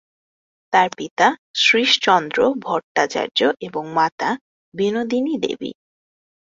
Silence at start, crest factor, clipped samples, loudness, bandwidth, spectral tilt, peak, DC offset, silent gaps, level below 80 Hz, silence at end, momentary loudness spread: 0.7 s; 20 dB; under 0.1%; -19 LUFS; 7.8 kHz; -3 dB/octave; -2 dBFS; under 0.1%; 1.11-1.17 s, 1.38-1.54 s, 2.84-2.95 s, 4.12-4.18 s, 4.41-4.72 s; -64 dBFS; 0.85 s; 11 LU